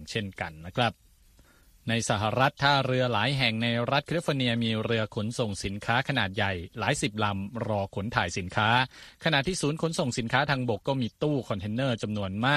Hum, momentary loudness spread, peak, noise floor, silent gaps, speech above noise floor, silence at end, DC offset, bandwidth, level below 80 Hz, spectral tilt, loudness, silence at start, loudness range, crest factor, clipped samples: none; 7 LU; -6 dBFS; -58 dBFS; none; 31 dB; 0 s; under 0.1%; 13.5 kHz; -54 dBFS; -5 dB/octave; -28 LUFS; 0 s; 3 LU; 22 dB; under 0.1%